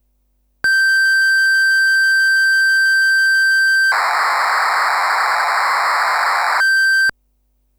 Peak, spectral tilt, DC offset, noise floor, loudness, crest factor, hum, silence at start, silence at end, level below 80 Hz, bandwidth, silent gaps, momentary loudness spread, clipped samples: -8 dBFS; 2.5 dB/octave; under 0.1%; -62 dBFS; -13 LUFS; 8 dB; 50 Hz at -60 dBFS; 0.65 s; 0.7 s; -60 dBFS; over 20 kHz; none; 4 LU; under 0.1%